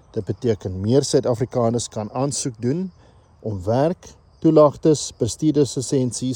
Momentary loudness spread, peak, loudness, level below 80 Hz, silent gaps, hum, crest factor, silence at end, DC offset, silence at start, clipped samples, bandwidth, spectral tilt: 12 LU; -2 dBFS; -21 LUFS; -54 dBFS; none; none; 18 dB; 0 s; under 0.1%; 0.15 s; under 0.1%; 17 kHz; -6 dB/octave